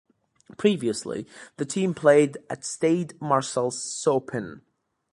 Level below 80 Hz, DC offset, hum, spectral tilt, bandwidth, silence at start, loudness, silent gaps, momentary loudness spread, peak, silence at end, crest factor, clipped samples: -68 dBFS; under 0.1%; none; -5 dB/octave; 11.5 kHz; 0.5 s; -25 LUFS; none; 15 LU; -4 dBFS; 0.55 s; 22 dB; under 0.1%